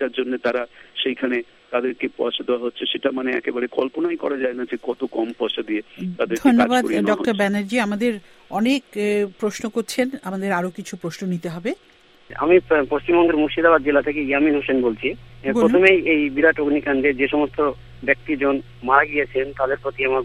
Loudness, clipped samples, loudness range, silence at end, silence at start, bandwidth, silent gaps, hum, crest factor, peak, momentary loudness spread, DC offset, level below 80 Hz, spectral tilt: -20 LUFS; under 0.1%; 6 LU; 0 s; 0 s; 15 kHz; none; none; 20 dB; 0 dBFS; 11 LU; under 0.1%; -50 dBFS; -5 dB/octave